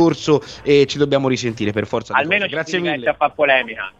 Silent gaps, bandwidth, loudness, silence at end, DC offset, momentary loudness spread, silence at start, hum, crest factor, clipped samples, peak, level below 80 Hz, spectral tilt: none; 8 kHz; -18 LUFS; 0.1 s; under 0.1%; 6 LU; 0 s; none; 16 dB; under 0.1%; 0 dBFS; -52 dBFS; -5 dB/octave